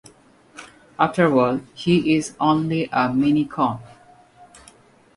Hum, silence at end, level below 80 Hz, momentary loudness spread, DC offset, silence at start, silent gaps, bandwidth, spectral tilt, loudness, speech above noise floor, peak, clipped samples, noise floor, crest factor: none; 1.3 s; -56 dBFS; 15 LU; under 0.1%; 0.55 s; none; 11.5 kHz; -6.5 dB/octave; -20 LUFS; 32 dB; -4 dBFS; under 0.1%; -52 dBFS; 18 dB